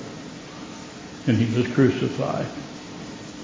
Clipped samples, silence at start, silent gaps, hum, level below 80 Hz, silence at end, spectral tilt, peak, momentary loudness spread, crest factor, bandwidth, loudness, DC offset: under 0.1%; 0 s; none; none; -54 dBFS; 0 s; -6.5 dB/octave; -6 dBFS; 18 LU; 20 dB; 7.6 kHz; -23 LUFS; under 0.1%